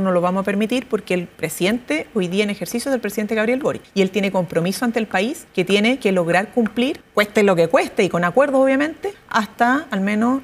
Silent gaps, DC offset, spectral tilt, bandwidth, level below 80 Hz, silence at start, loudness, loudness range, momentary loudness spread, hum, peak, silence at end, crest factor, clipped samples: none; under 0.1%; -5.5 dB/octave; 16 kHz; -56 dBFS; 0 s; -19 LUFS; 4 LU; 6 LU; none; -2 dBFS; 0 s; 16 dB; under 0.1%